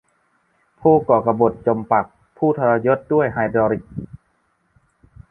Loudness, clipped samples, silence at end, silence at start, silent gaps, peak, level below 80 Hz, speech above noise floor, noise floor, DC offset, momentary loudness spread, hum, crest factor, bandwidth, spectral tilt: -18 LUFS; under 0.1%; 1.15 s; 0.8 s; none; -2 dBFS; -52 dBFS; 48 dB; -65 dBFS; under 0.1%; 14 LU; none; 18 dB; 3.5 kHz; -11 dB/octave